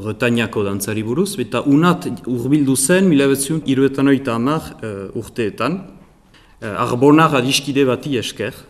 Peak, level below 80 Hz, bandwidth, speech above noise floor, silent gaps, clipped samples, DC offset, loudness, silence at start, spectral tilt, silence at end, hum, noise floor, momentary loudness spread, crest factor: 0 dBFS; -50 dBFS; 15.5 kHz; 32 dB; none; under 0.1%; under 0.1%; -17 LUFS; 0 s; -5 dB/octave; 0.05 s; none; -48 dBFS; 12 LU; 16 dB